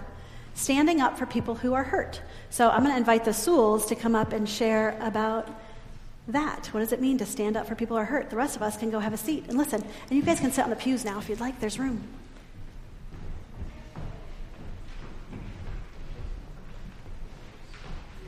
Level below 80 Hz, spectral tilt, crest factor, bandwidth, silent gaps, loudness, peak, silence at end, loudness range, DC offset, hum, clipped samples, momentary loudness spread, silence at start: -44 dBFS; -4.5 dB/octave; 22 dB; 15.5 kHz; none; -27 LUFS; -8 dBFS; 0 s; 19 LU; under 0.1%; none; under 0.1%; 23 LU; 0 s